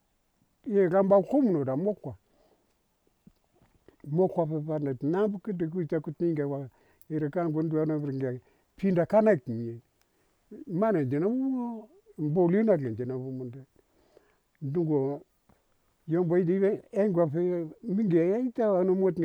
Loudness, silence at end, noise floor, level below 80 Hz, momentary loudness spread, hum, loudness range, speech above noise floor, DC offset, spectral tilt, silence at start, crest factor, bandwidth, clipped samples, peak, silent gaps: -28 LUFS; 0 s; -72 dBFS; -68 dBFS; 14 LU; none; 4 LU; 45 dB; under 0.1%; -10.5 dB/octave; 0.65 s; 18 dB; 6.6 kHz; under 0.1%; -10 dBFS; none